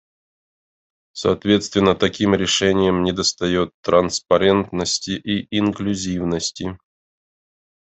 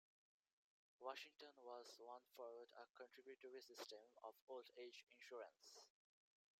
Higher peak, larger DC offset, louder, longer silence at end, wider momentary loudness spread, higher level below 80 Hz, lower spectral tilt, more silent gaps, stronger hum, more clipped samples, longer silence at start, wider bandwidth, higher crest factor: first, -2 dBFS vs -38 dBFS; neither; first, -19 LUFS vs -60 LUFS; first, 1.25 s vs 0.7 s; about the same, 7 LU vs 7 LU; first, -56 dBFS vs under -90 dBFS; first, -4.5 dB/octave vs -0.5 dB/octave; about the same, 3.74-3.83 s vs 2.90-2.94 s, 4.42-4.47 s; neither; neither; first, 1.15 s vs 1 s; second, 8.4 kHz vs 16 kHz; second, 18 dB vs 24 dB